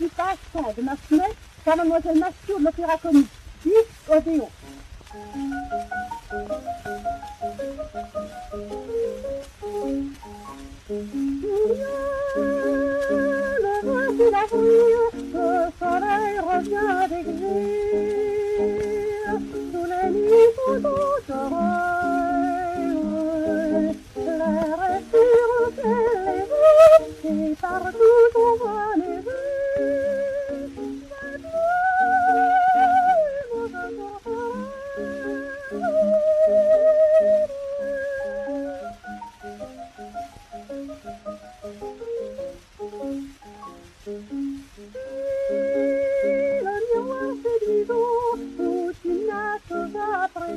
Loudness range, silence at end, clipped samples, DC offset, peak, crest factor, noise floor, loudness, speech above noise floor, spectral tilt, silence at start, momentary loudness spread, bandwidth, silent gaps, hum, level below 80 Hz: 14 LU; 0 s; under 0.1%; under 0.1%; -2 dBFS; 20 dB; -43 dBFS; -22 LUFS; 22 dB; -6 dB/octave; 0 s; 19 LU; 13 kHz; none; none; -48 dBFS